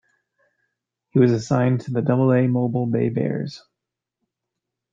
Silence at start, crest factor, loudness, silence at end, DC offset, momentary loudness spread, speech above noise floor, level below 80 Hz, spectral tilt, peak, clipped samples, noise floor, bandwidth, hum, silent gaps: 1.15 s; 18 dB; -21 LUFS; 1.35 s; under 0.1%; 7 LU; 65 dB; -62 dBFS; -8.5 dB/octave; -4 dBFS; under 0.1%; -84 dBFS; 7.6 kHz; none; none